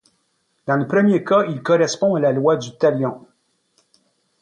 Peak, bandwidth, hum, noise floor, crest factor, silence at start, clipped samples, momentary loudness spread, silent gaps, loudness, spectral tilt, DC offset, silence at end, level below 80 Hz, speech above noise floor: -6 dBFS; 9.8 kHz; none; -67 dBFS; 14 dB; 0.65 s; under 0.1%; 8 LU; none; -18 LUFS; -6 dB/octave; under 0.1%; 1.25 s; -66 dBFS; 50 dB